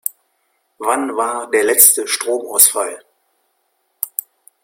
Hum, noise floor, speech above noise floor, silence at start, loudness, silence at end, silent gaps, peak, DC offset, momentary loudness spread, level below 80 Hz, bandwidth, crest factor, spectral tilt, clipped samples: none; -66 dBFS; 51 dB; 0.05 s; -14 LUFS; 0.55 s; none; 0 dBFS; under 0.1%; 17 LU; -68 dBFS; over 20 kHz; 18 dB; 0.5 dB/octave; 0.1%